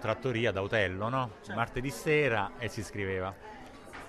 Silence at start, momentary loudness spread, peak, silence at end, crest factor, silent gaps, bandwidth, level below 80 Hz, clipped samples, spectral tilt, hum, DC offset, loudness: 0 s; 15 LU; -14 dBFS; 0 s; 18 dB; none; 14 kHz; -54 dBFS; under 0.1%; -5.5 dB/octave; none; under 0.1%; -32 LUFS